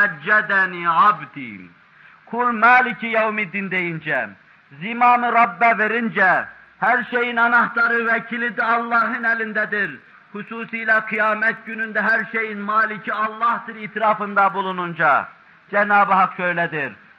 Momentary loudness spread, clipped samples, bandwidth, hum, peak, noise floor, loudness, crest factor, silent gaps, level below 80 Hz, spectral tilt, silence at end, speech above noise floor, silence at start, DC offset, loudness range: 11 LU; under 0.1%; 6.6 kHz; none; -4 dBFS; -48 dBFS; -18 LUFS; 16 dB; none; -72 dBFS; -7 dB/octave; 0.25 s; 29 dB; 0 s; under 0.1%; 3 LU